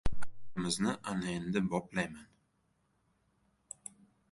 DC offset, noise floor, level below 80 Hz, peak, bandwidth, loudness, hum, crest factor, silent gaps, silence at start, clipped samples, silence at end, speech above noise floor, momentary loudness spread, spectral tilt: under 0.1%; -76 dBFS; -50 dBFS; -16 dBFS; 11.5 kHz; -36 LUFS; none; 18 dB; none; 0.05 s; under 0.1%; 2.1 s; 41 dB; 17 LU; -4.5 dB/octave